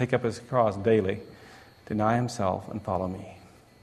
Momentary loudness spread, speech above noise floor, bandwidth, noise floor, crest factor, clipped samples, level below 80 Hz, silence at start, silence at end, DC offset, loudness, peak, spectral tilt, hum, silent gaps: 14 LU; 23 dB; 13.5 kHz; -50 dBFS; 20 dB; under 0.1%; -58 dBFS; 0 s; 0.35 s; under 0.1%; -28 LUFS; -8 dBFS; -7 dB/octave; none; none